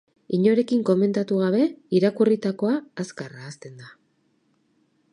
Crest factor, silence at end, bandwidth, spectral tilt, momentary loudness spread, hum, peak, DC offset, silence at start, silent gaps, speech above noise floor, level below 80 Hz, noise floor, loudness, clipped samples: 16 dB; 1.25 s; 10.5 kHz; -7.5 dB/octave; 18 LU; none; -8 dBFS; under 0.1%; 0.3 s; none; 45 dB; -74 dBFS; -67 dBFS; -22 LUFS; under 0.1%